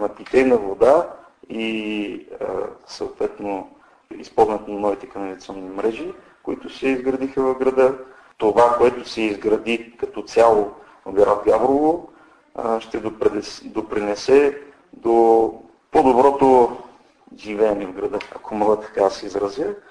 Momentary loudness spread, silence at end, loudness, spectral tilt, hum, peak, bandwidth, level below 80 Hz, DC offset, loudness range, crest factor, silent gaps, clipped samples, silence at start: 16 LU; 0.1 s; -20 LUFS; -5.5 dB/octave; none; -2 dBFS; 10.5 kHz; -52 dBFS; under 0.1%; 7 LU; 18 dB; none; under 0.1%; 0 s